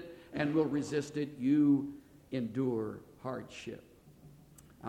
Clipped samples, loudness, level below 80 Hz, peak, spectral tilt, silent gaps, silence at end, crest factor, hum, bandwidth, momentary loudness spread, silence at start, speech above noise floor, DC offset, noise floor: under 0.1%; -34 LUFS; -68 dBFS; -18 dBFS; -7 dB/octave; none; 0 s; 16 dB; none; 10 kHz; 17 LU; 0 s; 25 dB; under 0.1%; -58 dBFS